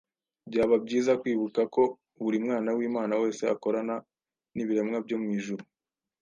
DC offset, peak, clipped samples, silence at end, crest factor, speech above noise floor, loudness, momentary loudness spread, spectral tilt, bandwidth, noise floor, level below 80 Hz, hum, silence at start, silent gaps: under 0.1%; -12 dBFS; under 0.1%; 0.6 s; 16 dB; over 62 dB; -29 LUFS; 10 LU; -6 dB/octave; 9.6 kHz; under -90 dBFS; -70 dBFS; none; 0.45 s; none